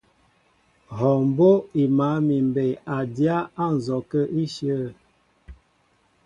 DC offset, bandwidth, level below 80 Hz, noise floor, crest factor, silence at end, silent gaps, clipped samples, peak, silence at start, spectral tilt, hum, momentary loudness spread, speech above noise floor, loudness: under 0.1%; 9.8 kHz; -56 dBFS; -64 dBFS; 18 dB; 0.7 s; none; under 0.1%; -6 dBFS; 0.9 s; -8.5 dB/octave; none; 10 LU; 43 dB; -22 LUFS